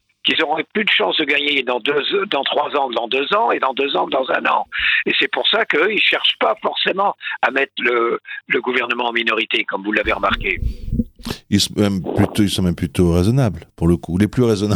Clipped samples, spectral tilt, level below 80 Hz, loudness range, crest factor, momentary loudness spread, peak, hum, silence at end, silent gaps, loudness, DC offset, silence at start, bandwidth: under 0.1%; -5 dB/octave; -38 dBFS; 3 LU; 18 dB; 5 LU; 0 dBFS; none; 0 s; none; -17 LUFS; under 0.1%; 0.25 s; 19 kHz